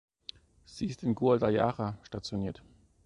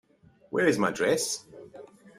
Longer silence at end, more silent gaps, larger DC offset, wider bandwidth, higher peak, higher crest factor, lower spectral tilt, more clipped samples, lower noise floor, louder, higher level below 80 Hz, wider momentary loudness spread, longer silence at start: first, 0.5 s vs 0.35 s; neither; neither; second, 11 kHz vs 15 kHz; about the same, -12 dBFS vs -10 dBFS; about the same, 20 dB vs 20 dB; first, -7 dB/octave vs -3.5 dB/octave; neither; second, -54 dBFS vs -59 dBFS; second, -31 LUFS vs -27 LUFS; first, -58 dBFS vs -68 dBFS; about the same, 21 LU vs 23 LU; first, 0.7 s vs 0.5 s